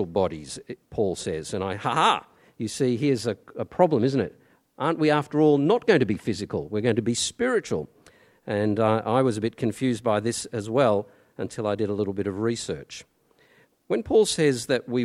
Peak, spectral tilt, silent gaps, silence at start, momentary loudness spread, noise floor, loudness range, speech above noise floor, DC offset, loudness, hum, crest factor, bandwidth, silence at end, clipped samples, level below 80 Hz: -6 dBFS; -5.5 dB/octave; none; 0 s; 13 LU; -61 dBFS; 4 LU; 37 dB; under 0.1%; -25 LUFS; none; 20 dB; 13.5 kHz; 0 s; under 0.1%; -58 dBFS